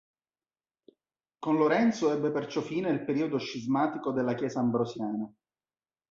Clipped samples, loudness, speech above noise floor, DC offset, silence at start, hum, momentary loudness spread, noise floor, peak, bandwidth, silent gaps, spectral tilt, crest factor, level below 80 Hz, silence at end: under 0.1%; -29 LUFS; over 62 dB; under 0.1%; 1.4 s; none; 9 LU; under -90 dBFS; -12 dBFS; 7.6 kHz; none; -6.5 dB/octave; 18 dB; -72 dBFS; 0.8 s